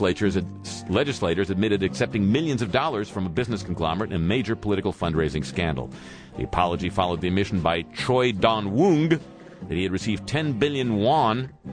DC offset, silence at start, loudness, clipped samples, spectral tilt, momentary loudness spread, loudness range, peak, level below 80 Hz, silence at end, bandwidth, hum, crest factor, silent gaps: under 0.1%; 0 s; -24 LUFS; under 0.1%; -6 dB/octave; 8 LU; 3 LU; -6 dBFS; -44 dBFS; 0 s; 10.5 kHz; none; 18 dB; none